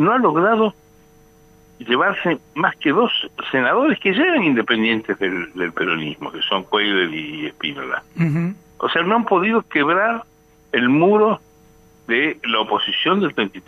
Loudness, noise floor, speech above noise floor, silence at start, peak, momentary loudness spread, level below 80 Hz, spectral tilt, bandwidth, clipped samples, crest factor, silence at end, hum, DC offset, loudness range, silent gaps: -18 LUFS; -50 dBFS; 32 dB; 0 s; -2 dBFS; 10 LU; -60 dBFS; -7 dB/octave; 13 kHz; under 0.1%; 18 dB; 0.05 s; none; under 0.1%; 3 LU; none